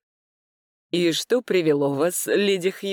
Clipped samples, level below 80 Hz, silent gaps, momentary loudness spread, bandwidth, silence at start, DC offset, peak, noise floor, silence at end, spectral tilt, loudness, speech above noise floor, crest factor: under 0.1%; -80 dBFS; none; 3 LU; 19.5 kHz; 0.95 s; under 0.1%; -10 dBFS; under -90 dBFS; 0 s; -4 dB/octave; -22 LUFS; over 68 dB; 14 dB